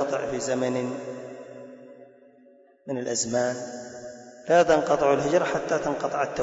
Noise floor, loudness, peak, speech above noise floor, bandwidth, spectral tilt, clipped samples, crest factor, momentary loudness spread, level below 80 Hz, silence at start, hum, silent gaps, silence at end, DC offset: -56 dBFS; -25 LUFS; -8 dBFS; 31 dB; 8 kHz; -4 dB/octave; under 0.1%; 18 dB; 21 LU; -60 dBFS; 0 s; none; none; 0 s; under 0.1%